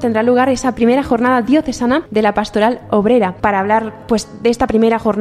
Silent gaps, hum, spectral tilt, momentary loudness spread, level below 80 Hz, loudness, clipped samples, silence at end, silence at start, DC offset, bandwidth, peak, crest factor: none; none; -5.5 dB/octave; 4 LU; -40 dBFS; -14 LUFS; under 0.1%; 0 s; 0 s; under 0.1%; 13 kHz; -2 dBFS; 12 dB